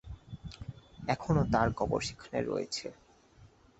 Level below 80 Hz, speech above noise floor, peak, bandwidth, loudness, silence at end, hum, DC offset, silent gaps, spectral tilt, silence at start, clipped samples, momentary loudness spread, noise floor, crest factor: -50 dBFS; 28 dB; -12 dBFS; 8.2 kHz; -32 LUFS; 0.35 s; none; under 0.1%; none; -5.5 dB/octave; 0.05 s; under 0.1%; 18 LU; -60 dBFS; 22 dB